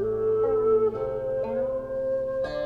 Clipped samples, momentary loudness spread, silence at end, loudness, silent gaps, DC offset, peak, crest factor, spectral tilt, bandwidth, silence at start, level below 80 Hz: under 0.1%; 7 LU; 0 s; -26 LUFS; none; under 0.1%; -14 dBFS; 12 dB; -8 dB/octave; 5.2 kHz; 0 s; -50 dBFS